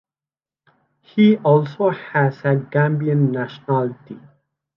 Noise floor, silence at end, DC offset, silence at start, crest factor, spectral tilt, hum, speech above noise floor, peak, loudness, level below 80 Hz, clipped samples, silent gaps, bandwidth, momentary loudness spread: under -90 dBFS; 0.6 s; under 0.1%; 1.15 s; 16 dB; -10 dB/octave; none; over 72 dB; -2 dBFS; -19 LUFS; -68 dBFS; under 0.1%; none; 5.8 kHz; 12 LU